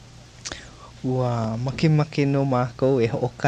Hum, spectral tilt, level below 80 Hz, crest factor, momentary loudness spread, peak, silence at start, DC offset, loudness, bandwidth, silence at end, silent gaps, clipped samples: none; -7 dB/octave; -50 dBFS; 18 dB; 14 LU; -6 dBFS; 0.05 s; under 0.1%; -23 LUFS; 9.2 kHz; 0 s; none; under 0.1%